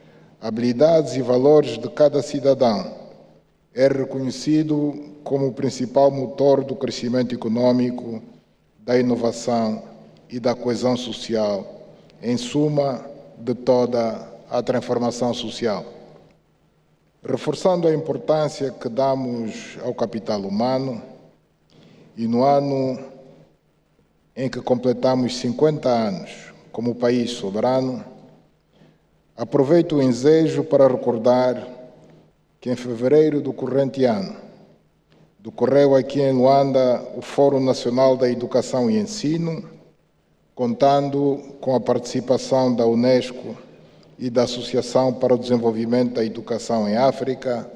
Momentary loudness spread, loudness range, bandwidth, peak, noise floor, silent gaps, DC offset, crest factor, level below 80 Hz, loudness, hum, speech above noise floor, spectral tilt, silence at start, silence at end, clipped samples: 14 LU; 6 LU; 10.5 kHz; -4 dBFS; -61 dBFS; none; under 0.1%; 16 dB; -60 dBFS; -20 LUFS; none; 41 dB; -6.5 dB/octave; 0.4 s; 0 s; under 0.1%